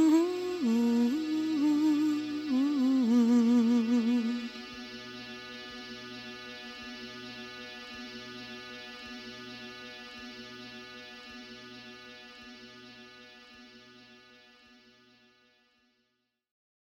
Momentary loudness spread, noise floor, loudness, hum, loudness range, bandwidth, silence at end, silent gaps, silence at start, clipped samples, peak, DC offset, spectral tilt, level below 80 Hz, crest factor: 22 LU; -80 dBFS; -31 LUFS; none; 22 LU; 13.5 kHz; 3.3 s; none; 0 s; under 0.1%; -14 dBFS; under 0.1%; -5 dB/octave; -72 dBFS; 18 dB